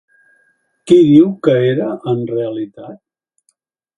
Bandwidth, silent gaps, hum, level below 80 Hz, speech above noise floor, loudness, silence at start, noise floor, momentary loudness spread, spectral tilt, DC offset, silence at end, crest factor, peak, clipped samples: 10.5 kHz; none; none; -58 dBFS; 52 dB; -13 LUFS; 0.85 s; -64 dBFS; 19 LU; -8 dB/octave; under 0.1%; 1.05 s; 16 dB; 0 dBFS; under 0.1%